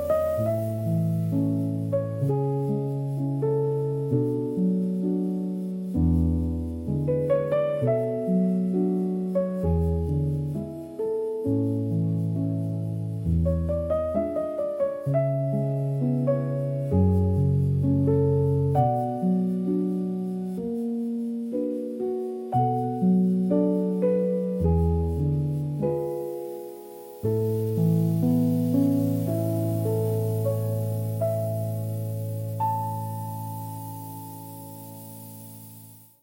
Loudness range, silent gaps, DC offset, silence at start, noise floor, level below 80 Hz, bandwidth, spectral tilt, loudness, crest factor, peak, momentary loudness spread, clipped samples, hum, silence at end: 5 LU; none; under 0.1%; 0 s; -48 dBFS; -46 dBFS; 17 kHz; -10 dB/octave; -26 LUFS; 14 dB; -10 dBFS; 10 LU; under 0.1%; none; 0.25 s